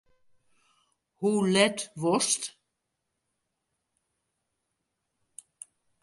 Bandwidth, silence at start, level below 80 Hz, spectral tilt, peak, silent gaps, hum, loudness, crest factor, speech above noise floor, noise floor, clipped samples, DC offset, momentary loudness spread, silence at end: 11.5 kHz; 1.2 s; -78 dBFS; -3.5 dB/octave; -8 dBFS; none; none; -26 LUFS; 24 dB; 56 dB; -82 dBFS; under 0.1%; under 0.1%; 25 LU; 3.55 s